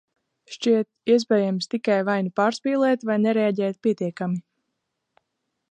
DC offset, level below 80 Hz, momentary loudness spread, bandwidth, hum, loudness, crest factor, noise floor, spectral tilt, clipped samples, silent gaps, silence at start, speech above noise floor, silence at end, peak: under 0.1%; -76 dBFS; 7 LU; 9.6 kHz; none; -23 LUFS; 16 dB; -79 dBFS; -6 dB/octave; under 0.1%; none; 0.5 s; 56 dB; 1.3 s; -8 dBFS